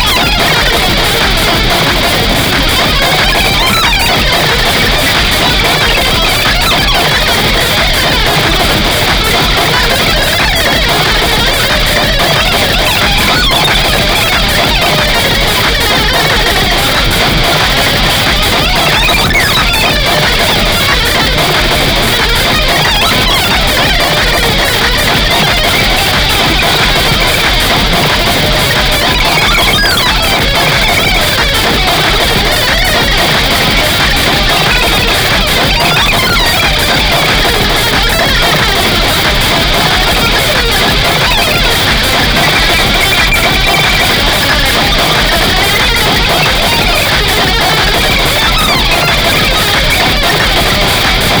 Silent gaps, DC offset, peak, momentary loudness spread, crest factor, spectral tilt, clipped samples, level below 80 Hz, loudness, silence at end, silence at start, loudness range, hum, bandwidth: none; under 0.1%; 0 dBFS; 1 LU; 8 dB; -3 dB/octave; under 0.1%; -18 dBFS; -8 LUFS; 0 s; 0 s; 1 LU; none; over 20 kHz